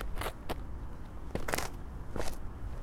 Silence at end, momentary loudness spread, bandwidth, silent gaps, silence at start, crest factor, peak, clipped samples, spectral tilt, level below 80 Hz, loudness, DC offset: 0 s; 10 LU; 17 kHz; none; 0 s; 24 dB; -12 dBFS; under 0.1%; -4.5 dB/octave; -42 dBFS; -41 LUFS; under 0.1%